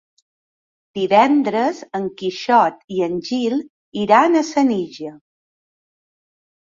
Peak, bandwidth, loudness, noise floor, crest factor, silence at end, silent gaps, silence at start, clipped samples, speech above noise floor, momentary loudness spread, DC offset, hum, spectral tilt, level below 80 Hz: -2 dBFS; 7.6 kHz; -18 LUFS; under -90 dBFS; 18 dB; 1.5 s; 2.84-2.88 s, 3.70-3.92 s; 0.95 s; under 0.1%; over 73 dB; 15 LU; under 0.1%; none; -5 dB/octave; -64 dBFS